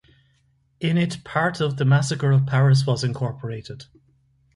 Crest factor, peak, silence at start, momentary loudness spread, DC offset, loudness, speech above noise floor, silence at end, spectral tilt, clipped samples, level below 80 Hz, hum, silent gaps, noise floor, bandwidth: 16 dB; -6 dBFS; 0.8 s; 15 LU; under 0.1%; -21 LUFS; 43 dB; 0.75 s; -6.5 dB/octave; under 0.1%; -56 dBFS; none; none; -64 dBFS; 11.5 kHz